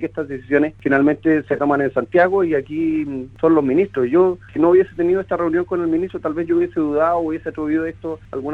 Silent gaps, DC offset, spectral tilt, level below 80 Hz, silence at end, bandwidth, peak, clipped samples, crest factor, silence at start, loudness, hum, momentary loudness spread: none; under 0.1%; -9 dB/octave; -50 dBFS; 0 s; 4.4 kHz; -2 dBFS; under 0.1%; 16 dB; 0 s; -18 LUFS; none; 9 LU